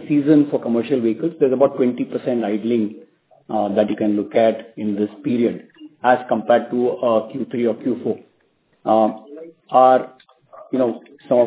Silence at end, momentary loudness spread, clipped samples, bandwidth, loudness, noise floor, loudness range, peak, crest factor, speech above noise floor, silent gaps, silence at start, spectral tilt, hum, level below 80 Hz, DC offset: 0 s; 11 LU; under 0.1%; 4 kHz; -19 LUFS; -62 dBFS; 2 LU; 0 dBFS; 18 dB; 44 dB; none; 0 s; -11 dB/octave; none; -68 dBFS; under 0.1%